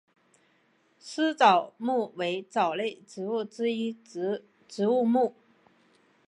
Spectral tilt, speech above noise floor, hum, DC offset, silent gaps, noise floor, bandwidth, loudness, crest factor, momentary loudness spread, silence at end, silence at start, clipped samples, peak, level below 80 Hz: -5 dB/octave; 40 dB; none; under 0.1%; none; -67 dBFS; 11 kHz; -28 LUFS; 22 dB; 14 LU; 1 s; 1.05 s; under 0.1%; -8 dBFS; -84 dBFS